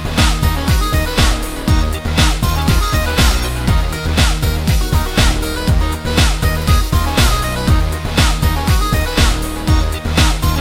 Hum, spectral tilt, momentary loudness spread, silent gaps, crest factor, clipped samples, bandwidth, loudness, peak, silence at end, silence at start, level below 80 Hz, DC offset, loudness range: none; -4.5 dB/octave; 3 LU; none; 14 dB; under 0.1%; 17 kHz; -15 LUFS; 0 dBFS; 0 s; 0 s; -16 dBFS; under 0.1%; 1 LU